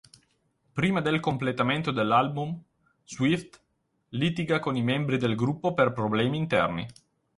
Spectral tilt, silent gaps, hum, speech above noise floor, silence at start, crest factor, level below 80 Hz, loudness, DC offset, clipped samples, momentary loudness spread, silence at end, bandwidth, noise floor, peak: -6.5 dB/octave; none; none; 48 dB; 0.75 s; 20 dB; -60 dBFS; -27 LUFS; under 0.1%; under 0.1%; 11 LU; 0.45 s; 11.5 kHz; -74 dBFS; -8 dBFS